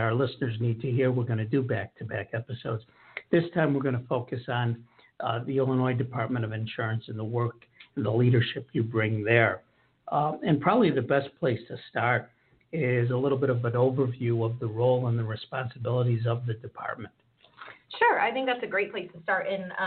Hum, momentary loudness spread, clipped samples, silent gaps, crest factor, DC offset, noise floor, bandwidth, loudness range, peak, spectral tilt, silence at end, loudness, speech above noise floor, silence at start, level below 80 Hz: none; 12 LU; under 0.1%; none; 22 dB; under 0.1%; -50 dBFS; 4.5 kHz; 4 LU; -6 dBFS; -6 dB/octave; 0 s; -28 LUFS; 23 dB; 0 s; -66 dBFS